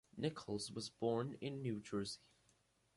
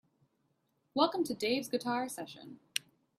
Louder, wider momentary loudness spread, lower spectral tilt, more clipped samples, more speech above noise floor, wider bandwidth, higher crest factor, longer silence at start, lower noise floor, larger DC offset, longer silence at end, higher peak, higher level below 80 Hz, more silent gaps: second, -44 LUFS vs -35 LUFS; second, 6 LU vs 13 LU; first, -5.5 dB/octave vs -3 dB/octave; neither; second, 34 dB vs 44 dB; second, 11.5 kHz vs 15.5 kHz; second, 18 dB vs 24 dB; second, 0.15 s vs 0.95 s; about the same, -77 dBFS vs -78 dBFS; neither; first, 0.8 s vs 0.4 s; second, -26 dBFS vs -12 dBFS; about the same, -74 dBFS vs -78 dBFS; neither